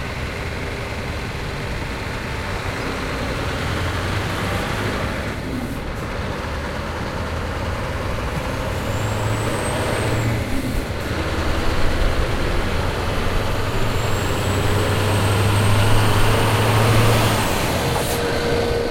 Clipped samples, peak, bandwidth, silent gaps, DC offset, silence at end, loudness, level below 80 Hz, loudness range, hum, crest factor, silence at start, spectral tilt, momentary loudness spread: under 0.1%; -4 dBFS; 16.5 kHz; none; under 0.1%; 0 s; -22 LUFS; -28 dBFS; 8 LU; none; 16 dB; 0 s; -5 dB/octave; 9 LU